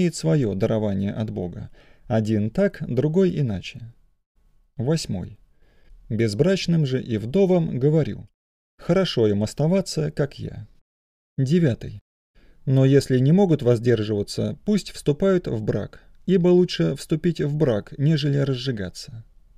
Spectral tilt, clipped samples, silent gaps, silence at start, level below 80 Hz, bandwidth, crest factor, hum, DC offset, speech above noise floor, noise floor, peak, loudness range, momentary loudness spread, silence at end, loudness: -7 dB/octave; under 0.1%; 4.26-4.35 s, 8.34-8.78 s, 10.81-11.37 s, 12.01-12.34 s; 0 s; -48 dBFS; 13.5 kHz; 16 dB; none; under 0.1%; 31 dB; -53 dBFS; -6 dBFS; 5 LU; 15 LU; 0.35 s; -22 LUFS